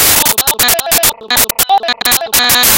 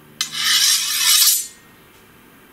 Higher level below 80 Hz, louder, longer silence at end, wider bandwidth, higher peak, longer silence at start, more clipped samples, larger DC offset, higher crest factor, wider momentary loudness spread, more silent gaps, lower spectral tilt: first, -36 dBFS vs -64 dBFS; first, -9 LUFS vs -14 LUFS; second, 0 s vs 1.05 s; first, over 20 kHz vs 16 kHz; about the same, 0 dBFS vs 0 dBFS; second, 0 s vs 0.2 s; first, 0.3% vs under 0.1%; neither; second, 10 dB vs 20 dB; second, 4 LU vs 11 LU; neither; first, 0 dB/octave vs 3.5 dB/octave